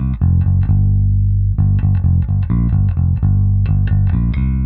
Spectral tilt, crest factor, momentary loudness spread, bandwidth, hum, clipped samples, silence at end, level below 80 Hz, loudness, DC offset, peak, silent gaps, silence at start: -13 dB/octave; 10 dB; 2 LU; 2.8 kHz; 50 Hz at -25 dBFS; under 0.1%; 0 s; -20 dBFS; -15 LUFS; under 0.1%; -2 dBFS; none; 0 s